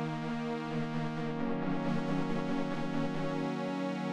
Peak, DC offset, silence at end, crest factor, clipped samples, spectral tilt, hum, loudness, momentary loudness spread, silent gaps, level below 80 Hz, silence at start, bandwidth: -20 dBFS; under 0.1%; 0 s; 12 dB; under 0.1%; -7 dB/octave; none; -35 LUFS; 2 LU; none; -56 dBFS; 0 s; 10.5 kHz